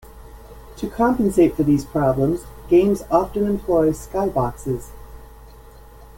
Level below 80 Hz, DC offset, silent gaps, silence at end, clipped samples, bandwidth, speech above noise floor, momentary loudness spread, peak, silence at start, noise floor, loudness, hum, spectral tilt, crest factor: -40 dBFS; under 0.1%; none; 0.1 s; under 0.1%; 17 kHz; 24 dB; 12 LU; -2 dBFS; 0.15 s; -43 dBFS; -20 LUFS; none; -7.5 dB/octave; 18 dB